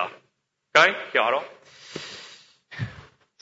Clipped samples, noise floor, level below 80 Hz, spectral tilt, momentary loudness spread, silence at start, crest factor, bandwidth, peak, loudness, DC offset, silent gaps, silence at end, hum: under 0.1%; -72 dBFS; -62 dBFS; -3 dB/octave; 24 LU; 0 s; 24 dB; 8 kHz; -2 dBFS; -21 LUFS; under 0.1%; none; 0.4 s; none